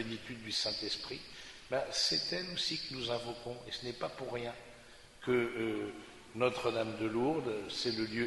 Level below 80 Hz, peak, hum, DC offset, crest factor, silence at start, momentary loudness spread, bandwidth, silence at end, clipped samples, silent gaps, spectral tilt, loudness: -64 dBFS; -16 dBFS; none; under 0.1%; 20 dB; 0 s; 13 LU; 11.5 kHz; 0 s; under 0.1%; none; -3.5 dB/octave; -36 LUFS